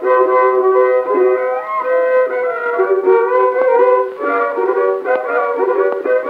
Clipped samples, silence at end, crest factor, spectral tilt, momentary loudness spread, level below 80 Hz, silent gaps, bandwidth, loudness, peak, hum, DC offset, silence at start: under 0.1%; 0 s; 12 dB; -6 dB/octave; 5 LU; -70 dBFS; none; 4.5 kHz; -14 LUFS; 0 dBFS; none; under 0.1%; 0 s